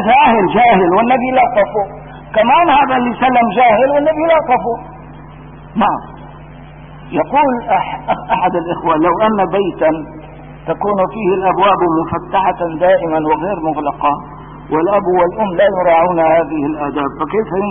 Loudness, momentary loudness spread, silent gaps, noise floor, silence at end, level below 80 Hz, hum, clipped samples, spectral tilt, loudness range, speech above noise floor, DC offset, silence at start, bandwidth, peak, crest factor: -13 LUFS; 12 LU; none; -34 dBFS; 0 s; -40 dBFS; none; under 0.1%; -11.5 dB/octave; 5 LU; 21 dB; 0.1%; 0 s; 3.7 kHz; 0 dBFS; 12 dB